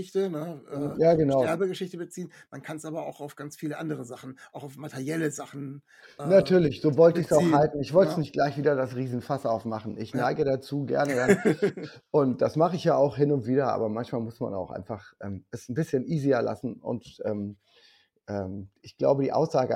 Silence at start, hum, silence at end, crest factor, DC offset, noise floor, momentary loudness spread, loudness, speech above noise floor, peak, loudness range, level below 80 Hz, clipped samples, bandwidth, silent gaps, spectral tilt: 0 s; none; 0 s; 20 dB; under 0.1%; -61 dBFS; 17 LU; -26 LUFS; 35 dB; -6 dBFS; 12 LU; -62 dBFS; under 0.1%; 16 kHz; none; -7 dB/octave